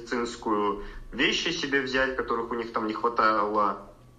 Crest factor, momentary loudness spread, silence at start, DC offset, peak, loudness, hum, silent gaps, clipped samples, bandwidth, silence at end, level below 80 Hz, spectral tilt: 18 dB; 8 LU; 0 s; under 0.1%; -10 dBFS; -26 LUFS; none; none; under 0.1%; 9.6 kHz; 0.1 s; -50 dBFS; -3.5 dB/octave